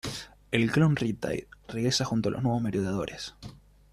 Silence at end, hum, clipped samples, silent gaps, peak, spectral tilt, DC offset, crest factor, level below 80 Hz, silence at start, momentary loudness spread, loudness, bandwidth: 0.35 s; none; under 0.1%; none; -8 dBFS; -5.5 dB/octave; under 0.1%; 22 dB; -54 dBFS; 0.05 s; 16 LU; -28 LUFS; 14.5 kHz